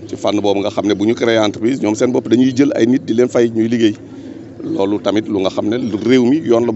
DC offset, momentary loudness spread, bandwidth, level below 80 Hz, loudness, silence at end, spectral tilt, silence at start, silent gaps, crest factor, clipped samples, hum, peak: under 0.1%; 6 LU; 8.2 kHz; -58 dBFS; -15 LUFS; 0 s; -6 dB/octave; 0 s; none; 14 dB; under 0.1%; none; 0 dBFS